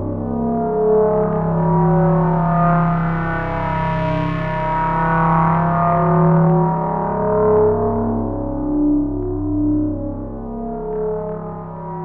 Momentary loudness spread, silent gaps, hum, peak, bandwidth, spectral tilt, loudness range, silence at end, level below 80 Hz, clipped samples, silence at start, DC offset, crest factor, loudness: 11 LU; none; none; -2 dBFS; 4.1 kHz; -11 dB/octave; 5 LU; 0 s; -32 dBFS; under 0.1%; 0 s; under 0.1%; 14 dB; -18 LUFS